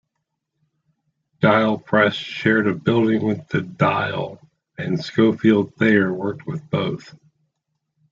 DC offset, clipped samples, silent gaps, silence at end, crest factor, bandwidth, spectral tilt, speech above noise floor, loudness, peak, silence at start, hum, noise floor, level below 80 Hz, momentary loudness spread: under 0.1%; under 0.1%; none; 1.15 s; 18 dB; 7.4 kHz; -7.5 dB/octave; 58 dB; -20 LUFS; -2 dBFS; 1.4 s; none; -78 dBFS; -60 dBFS; 10 LU